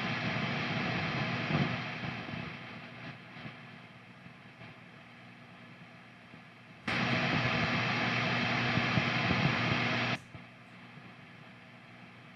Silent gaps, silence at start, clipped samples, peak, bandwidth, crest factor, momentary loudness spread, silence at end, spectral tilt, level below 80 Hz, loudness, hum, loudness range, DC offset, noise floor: none; 0 s; under 0.1%; -16 dBFS; 9.8 kHz; 20 dB; 22 LU; 0 s; -5.5 dB/octave; -62 dBFS; -32 LUFS; 60 Hz at -45 dBFS; 19 LU; under 0.1%; -53 dBFS